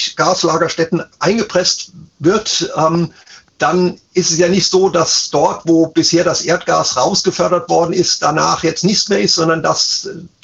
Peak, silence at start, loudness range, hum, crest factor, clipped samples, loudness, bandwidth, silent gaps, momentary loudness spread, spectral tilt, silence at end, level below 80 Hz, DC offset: -2 dBFS; 0 s; 3 LU; none; 14 dB; under 0.1%; -14 LUFS; 8.2 kHz; none; 5 LU; -3.5 dB/octave; 0.15 s; -50 dBFS; under 0.1%